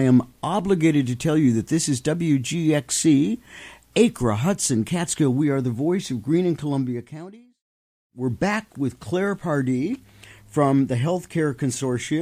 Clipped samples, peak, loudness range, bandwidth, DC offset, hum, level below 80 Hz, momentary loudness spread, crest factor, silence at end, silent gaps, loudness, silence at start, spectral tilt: under 0.1%; -4 dBFS; 6 LU; 15.5 kHz; under 0.1%; none; -54 dBFS; 10 LU; 18 dB; 0 s; 7.61-8.10 s; -22 LUFS; 0 s; -5.5 dB/octave